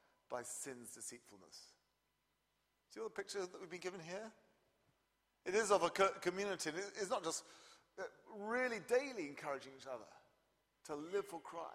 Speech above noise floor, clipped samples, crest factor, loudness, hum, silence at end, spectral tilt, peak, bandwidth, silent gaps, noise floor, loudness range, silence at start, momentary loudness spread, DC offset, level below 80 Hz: 41 dB; under 0.1%; 24 dB; -42 LUFS; none; 0 s; -3 dB/octave; -20 dBFS; 15.5 kHz; none; -84 dBFS; 11 LU; 0.3 s; 23 LU; under 0.1%; -84 dBFS